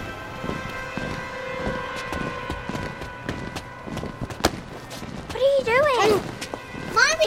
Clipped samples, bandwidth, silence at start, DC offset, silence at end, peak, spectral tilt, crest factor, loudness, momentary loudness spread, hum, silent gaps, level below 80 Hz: under 0.1%; 16.5 kHz; 0 s; under 0.1%; 0 s; -2 dBFS; -3.5 dB/octave; 24 dB; -26 LUFS; 15 LU; none; none; -44 dBFS